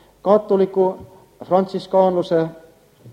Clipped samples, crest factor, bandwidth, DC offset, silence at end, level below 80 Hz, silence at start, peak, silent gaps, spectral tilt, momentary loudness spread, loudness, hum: under 0.1%; 18 dB; 9.2 kHz; under 0.1%; 0 s; -60 dBFS; 0.25 s; -2 dBFS; none; -8 dB/octave; 5 LU; -19 LUFS; none